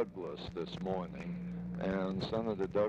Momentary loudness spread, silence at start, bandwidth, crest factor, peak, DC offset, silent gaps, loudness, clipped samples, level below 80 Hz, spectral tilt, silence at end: 7 LU; 0 s; 8 kHz; 16 dB; -20 dBFS; under 0.1%; none; -38 LUFS; under 0.1%; -58 dBFS; -8 dB/octave; 0 s